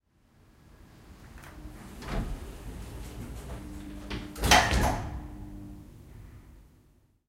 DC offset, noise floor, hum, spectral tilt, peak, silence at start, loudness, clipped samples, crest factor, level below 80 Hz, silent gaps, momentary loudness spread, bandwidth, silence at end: under 0.1%; -63 dBFS; none; -3.5 dB/octave; -6 dBFS; 0.65 s; -29 LUFS; under 0.1%; 28 dB; -40 dBFS; none; 28 LU; 16 kHz; 0.6 s